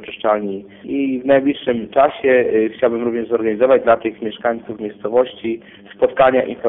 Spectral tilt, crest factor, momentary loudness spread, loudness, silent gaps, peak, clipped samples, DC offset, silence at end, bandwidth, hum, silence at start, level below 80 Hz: -10.5 dB/octave; 14 dB; 12 LU; -17 LUFS; none; -4 dBFS; under 0.1%; under 0.1%; 0 s; 3.9 kHz; none; 0 s; -54 dBFS